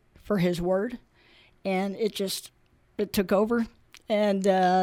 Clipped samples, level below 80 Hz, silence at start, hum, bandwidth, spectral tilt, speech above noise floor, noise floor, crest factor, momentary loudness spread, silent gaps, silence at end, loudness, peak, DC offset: under 0.1%; -54 dBFS; 0.25 s; none; 17 kHz; -5.5 dB/octave; 33 dB; -58 dBFS; 16 dB; 12 LU; none; 0 s; -27 LUFS; -10 dBFS; under 0.1%